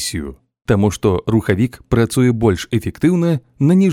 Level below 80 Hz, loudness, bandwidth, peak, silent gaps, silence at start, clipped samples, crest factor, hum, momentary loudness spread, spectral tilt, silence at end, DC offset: -38 dBFS; -16 LUFS; 16.5 kHz; -2 dBFS; none; 0 s; under 0.1%; 14 dB; none; 8 LU; -6.5 dB/octave; 0 s; under 0.1%